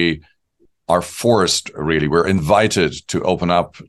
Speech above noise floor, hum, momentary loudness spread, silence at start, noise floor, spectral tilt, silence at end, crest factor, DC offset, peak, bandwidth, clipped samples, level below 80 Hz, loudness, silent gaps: 43 dB; none; 6 LU; 0 s; -60 dBFS; -4.5 dB/octave; 0.05 s; 16 dB; under 0.1%; -2 dBFS; 12.5 kHz; under 0.1%; -42 dBFS; -17 LUFS; none